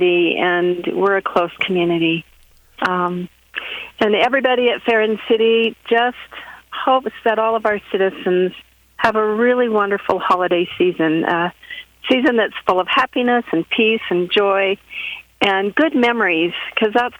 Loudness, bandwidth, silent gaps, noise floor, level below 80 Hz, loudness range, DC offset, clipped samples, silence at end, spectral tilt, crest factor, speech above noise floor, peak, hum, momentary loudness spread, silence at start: -17 LUFS; 19 kHz; none; -45 dBFS; -58 dBFS; 2 LU; under 0.1%; under 0.1%; 0.05 s; -6 dB/octave; 18 dB; 28 dB; 0 dBFS; none; 9 LU; 0 s